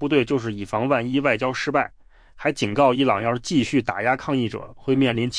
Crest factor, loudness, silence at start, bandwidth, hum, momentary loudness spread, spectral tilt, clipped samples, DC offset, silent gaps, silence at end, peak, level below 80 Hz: 16 dB; -22 LUFS; 0 s; 10.5 kHz; none; 7 LU; -5.5 dB/octave; under 0.1%; under 0.1%; none; 0 s; -6 dBFS; -52 dBFS